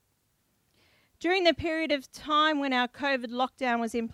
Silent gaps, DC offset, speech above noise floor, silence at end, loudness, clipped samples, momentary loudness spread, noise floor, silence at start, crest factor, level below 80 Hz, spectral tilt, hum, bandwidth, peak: none; under 0.1%; 45 dB; 0 s; -27 LUFS; under 0.1%; 6 LU; -73 dBFS; 1.2 s; 20 dB; -60 dBFS; -4 dB/octave; none; 15 kHz; -10 dBFS